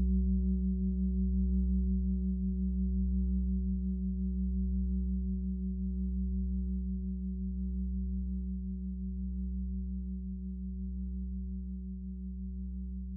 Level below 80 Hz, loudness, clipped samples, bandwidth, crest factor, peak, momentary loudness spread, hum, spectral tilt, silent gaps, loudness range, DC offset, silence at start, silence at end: -36 dBFS; -35 LUFS; under 0.1%; 0.6 kHz; 12 dB; -22 dBFS; 9 LU; none; -15.5 dB/octave; none; 7 LU; under 0.1%; 0 s; 0 s